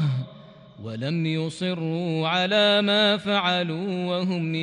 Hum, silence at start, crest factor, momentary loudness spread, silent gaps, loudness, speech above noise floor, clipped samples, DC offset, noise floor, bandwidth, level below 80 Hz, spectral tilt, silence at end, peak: none; 0 s; 14 dB; 12 LU; none; -23 LUFS; 23 dB; under 0.1%; under 0.1%; -46 dBFS; 10.5 kHz; -68 dBFS; -6 dB/octave; 0 s; -10 dBFS